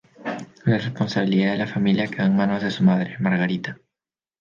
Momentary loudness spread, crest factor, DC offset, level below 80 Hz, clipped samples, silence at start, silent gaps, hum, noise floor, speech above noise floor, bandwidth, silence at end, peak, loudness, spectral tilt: 10 LU; 14 dB; under 0.1%; -60 dBFS; under 0.1%; 0.2 s; none; none; -90 dBFS; 69 dB; 7.2 kHz; 0.65 s; -8 dBFS; -22 LUFS; -7.5 dB/octave